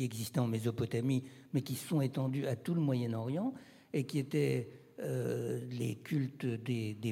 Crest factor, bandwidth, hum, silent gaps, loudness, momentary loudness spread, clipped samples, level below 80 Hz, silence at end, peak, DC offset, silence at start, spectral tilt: 16 dB; 16.5 kHz; none; none; -36 LUFS; 6 LU; under 0.1%; -76 dBFS; 0 s; -20 dBFS; under 0.1%; 0 s; -7 dB/octave